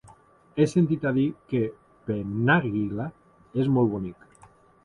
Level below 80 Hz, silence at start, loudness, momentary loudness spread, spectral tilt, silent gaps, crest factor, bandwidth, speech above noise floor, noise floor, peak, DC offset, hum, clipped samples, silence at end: -56 dBFS; 0.55 s; -26 LUFS; 13 LU; -8 dB/octave; none; 20 dB; 11 kHz; 31 dB; -55 dBFS; -6 dBFS; under 0.1%; none; under 0.1%; 0.7 s